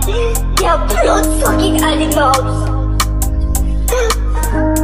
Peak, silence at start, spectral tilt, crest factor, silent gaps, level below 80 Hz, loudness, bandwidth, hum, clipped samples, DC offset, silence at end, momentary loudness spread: 0 dBFS; 0 s; -4.5 dB/octave; 12 dB; none; -16 dBFS; -14 LUFS; 16.5 kHz; none; under 0.1%; 1%; 0 s; 5 LU